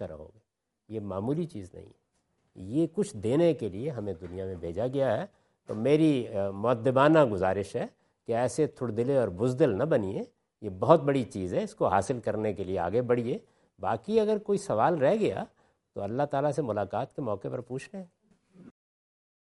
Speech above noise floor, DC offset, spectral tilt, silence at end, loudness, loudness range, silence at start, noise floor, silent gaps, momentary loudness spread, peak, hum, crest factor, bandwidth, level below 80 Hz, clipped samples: 50 dB; under 0.1%; -7 dB/octave; 0.8 s; -28 LUFS; 7 LU; 0 s; -78 dBFS; none; 16 LU; -4 dBFS; none; 24 dB; 11.5 kHz; -66 dBFS; under 0.1%